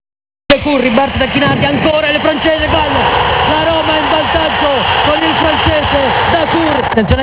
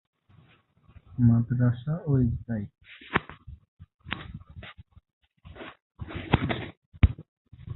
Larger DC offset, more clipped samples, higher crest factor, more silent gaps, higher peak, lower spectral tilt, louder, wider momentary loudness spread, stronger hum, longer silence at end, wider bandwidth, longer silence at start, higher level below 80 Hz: neither; first, 0.2% vs under 0.1%; second, 12 dB vs 26 dB; second, none vs 3.68-3.77 s, 5.13-5.21 s, 5.82-5.90 s, 6.77-6.92 s, 7.28-7.45 s; about the same, 0 dBFS vs -2 dBFS; second, -9 dB/octave vs -11.5 dB/octave; first, -11 LUFS vs -28 LUFS; second, 1 LU vs 22 LU; neither; about the same, 0 s vs 0 s; about the same, 4 kHz vs 4.1 kHz; second, 0.5 s vs 1.1 s; first, -28 dBFS vs -38 dBFS